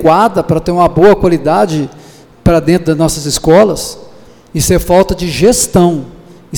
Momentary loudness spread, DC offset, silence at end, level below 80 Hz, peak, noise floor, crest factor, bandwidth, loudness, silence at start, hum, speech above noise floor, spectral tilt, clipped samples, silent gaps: 10 LU; under 0.1%; 0 s; -28 dBFS; 0 dBFS; -38 dBFS; 10 dB; 19.5 kHz; -10 LUFS; 0 s; none; 29 dB; -5 dB/octave; under 0.1%; none